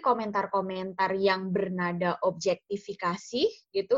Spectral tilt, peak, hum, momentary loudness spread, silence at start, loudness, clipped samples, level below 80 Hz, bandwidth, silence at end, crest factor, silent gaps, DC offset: -5.5 dB/octave; -10 dBFS; none; 6 LU; 0 s; -29 LUFS; under 0.1%; -70 dBFS; 7.8 kHz; 0 s; 18 dB; none; under 0.1%